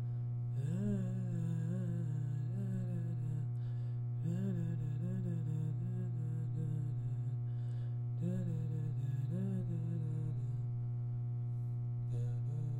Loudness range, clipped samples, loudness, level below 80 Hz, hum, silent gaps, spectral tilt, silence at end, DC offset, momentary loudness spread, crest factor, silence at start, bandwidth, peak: 1 LU; under 0.1%; -39 LUFS; -62 dBFS; 60 Hz at -40 dBFS; none; -10 dB/octave; 0 s; under 0.1%; 2 LU; 10 dB; 0 s; 7.8 kHz; -26 dBFS